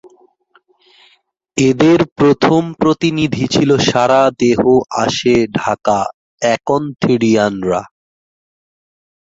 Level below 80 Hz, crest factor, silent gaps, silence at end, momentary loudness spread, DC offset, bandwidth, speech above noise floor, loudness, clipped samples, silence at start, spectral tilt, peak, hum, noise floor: -48 dBFS; 14 dB; 2.12-2.16 s, 6.14-6.38 s; 1.55 s; 7 LU; under 0.1%; 7.8 kHz; 43 dB; -14 LUFS; under 0.1%; 1.55 s; -5.5 dB/octave; 0 dBFS; none; -55 dBFS